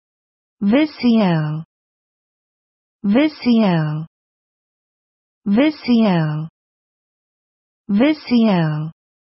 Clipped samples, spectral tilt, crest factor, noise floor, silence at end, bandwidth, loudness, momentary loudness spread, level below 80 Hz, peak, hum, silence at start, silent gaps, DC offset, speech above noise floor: under 0.1%; -6.5 dB/octave; 16 dB; under -90 dBFS; 0.4 s; 5.8 kHz; -17 LUFS; 13 LU; -60 dBFS; -2 dBFS; none; 0.6 s; 1.65-2.99 s, 4.07-5.41 s, 6.49-7.84 s; under 0.1%; over 74 dB